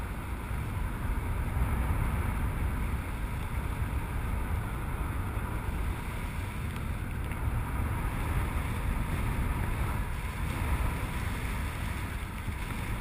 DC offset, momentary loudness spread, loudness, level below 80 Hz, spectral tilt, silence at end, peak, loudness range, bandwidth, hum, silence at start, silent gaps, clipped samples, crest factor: under 0.1%; 4 LU; -34 LUFS; -34 dBFS; -6 dB/octave; 0 s; -18 dBFS; 2 LU; 15.5 kHz; none; 0 s; none; under 0.1%; 14 dB